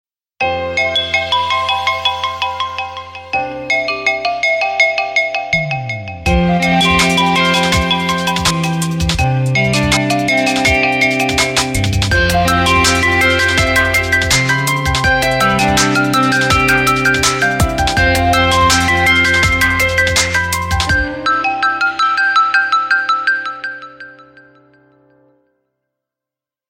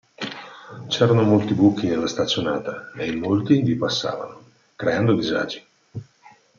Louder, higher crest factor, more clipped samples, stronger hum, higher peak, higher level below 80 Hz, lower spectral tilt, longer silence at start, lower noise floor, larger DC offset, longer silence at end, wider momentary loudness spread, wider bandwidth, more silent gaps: first, -13 LUFS vs -21 LUFS; second, 14 dB vs 20 dB; neither; neither; about the same, 0 dBFS vs -2 dBFS; first, -30 dBFS vs -60 dBFS; second, -3.5 dB/octave vs -6 dB/octave; first, 0.4 s vs 0.2 s; first, -86 dBFS vs -52 dBFS; neither; first, 2.5 s vs 0.55 s; second, 8 LU vs 20 LU; first, 16.5 kHz vs 7.4 kHz; neither